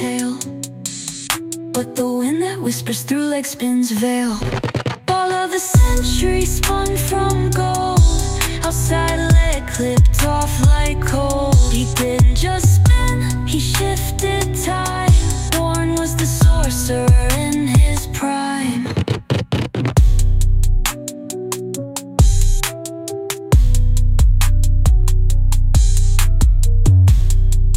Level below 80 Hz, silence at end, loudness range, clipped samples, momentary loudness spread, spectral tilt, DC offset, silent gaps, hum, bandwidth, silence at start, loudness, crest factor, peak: -18 dBFS; 0 s; 4 LU; under 0.1%; 8 LU; -5 dB/octave; under 0.1%; none; none; 16.5 kHz; 0 s; -17 LUFS; 12 dB; -2 dBFS